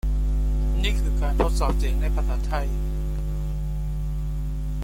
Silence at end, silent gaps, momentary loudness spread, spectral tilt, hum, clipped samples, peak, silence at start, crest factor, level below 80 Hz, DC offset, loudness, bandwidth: 0 s; none; 6 LU; -6.5 dB/octave; none; under 0.1%; -8 dBFS; 0.05 s; 16 dB; -24 dBFS; under 0.1%; -27 LUFS; 14 kHz